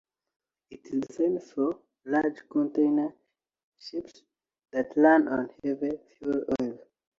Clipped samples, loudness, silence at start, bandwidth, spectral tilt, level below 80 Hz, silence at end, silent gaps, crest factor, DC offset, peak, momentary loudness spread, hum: under 0.1%; -28 LUFS; 0.7 s; 7.4 kHz; -7 dB/octave; -68 dBFS; 0.45 s; 3.64-3.72 s; 20 dB; under 0.1%; -8 dBFS; 16 LU; none